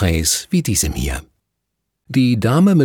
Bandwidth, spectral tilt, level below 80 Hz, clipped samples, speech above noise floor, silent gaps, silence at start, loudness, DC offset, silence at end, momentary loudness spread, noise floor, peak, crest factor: 18.5 kHz; -5 dB/octave; -30 dBFS; under 0.1%; 60 dB; none; 0 s; -17 LUFS; under 0.1%; 0 s; 10 LU; -76 dBFS; -2 dBFS; 14 dB